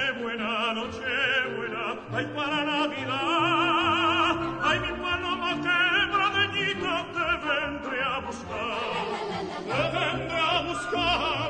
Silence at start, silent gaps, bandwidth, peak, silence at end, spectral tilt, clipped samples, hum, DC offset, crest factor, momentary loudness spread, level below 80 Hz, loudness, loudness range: 0 s; none; 9.4 kHz; -10 dBFS; 0 s; -4 dB/octave; under 0.1%; none; under 0.1%; 16 dB; 8 LU; -52 dBFS; -26 LUFS; 4 LU